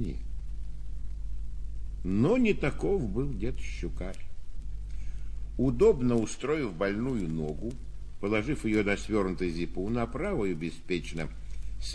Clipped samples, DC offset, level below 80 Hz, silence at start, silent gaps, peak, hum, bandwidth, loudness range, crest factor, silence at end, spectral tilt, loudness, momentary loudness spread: under 0.1%; under 0.1%; -38 dBFS; 0 s; none; -12 dBFS; 50 Hz at -40 dBFS; 11 kHz; 2 LU; 18 dB; 0 s; -6.5 dB/octave; -31 LUFS; 17 LU